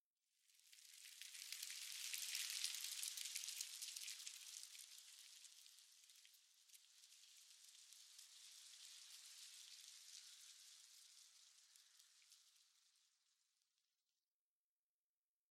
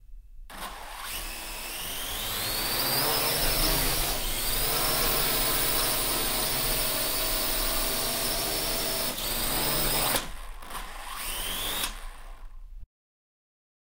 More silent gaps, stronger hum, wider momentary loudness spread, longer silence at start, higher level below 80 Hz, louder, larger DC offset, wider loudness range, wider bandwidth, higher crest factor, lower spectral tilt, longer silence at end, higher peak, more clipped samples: neither; neither; first, 21 LU vs 15 LU; first, 0.5 s vs 0.05 s; second, under -90 dBFS vs -38 dBFS; second, -52 LUFS vs -26 LUFS; neither; first, 16 LU vs 6 LU; about the same, 16 kHz vs 16 kHz; first, 34 dB vs 18 dB; second, 8 dB/octave vs -1.5 dB/octave; first, 2.45 s vs 1 s; second, -24 dBFS vs -10 dBFS; neither